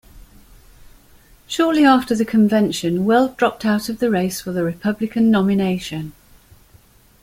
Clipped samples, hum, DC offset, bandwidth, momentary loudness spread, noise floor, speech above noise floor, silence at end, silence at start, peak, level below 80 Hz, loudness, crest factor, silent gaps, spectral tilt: under 0.1%; none; under 0.1%; 16 kHz; 9 LU; -51 dBFS; 33 dB; 1.1 s; 0.15 s; -2 dBFS; -50 dBFS; -18 LUFS; 18 dB; none; -6 dB/octave